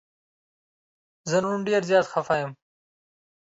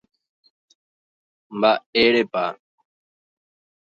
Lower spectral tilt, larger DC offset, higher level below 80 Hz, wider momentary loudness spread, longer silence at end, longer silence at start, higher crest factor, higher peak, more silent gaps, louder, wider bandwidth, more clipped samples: about the same, -5 dB/octave vs -5.5 dB/octave; neither; second, -70 dBFS vs -64 dBFS; about the same, 10 LU vs 11 LU; second, 1.05 s vs 1.35 s; second, 1.25 s vs 1.5 s; about the same, 20 dB vs 22 dB; second, -8 dBFS vs -4 dBFS; second, none vs 1.86-1.93 s; second, -24 LUFS vs -20 LUFS; about the same, 8 kHz vs 7.4 kHz; neither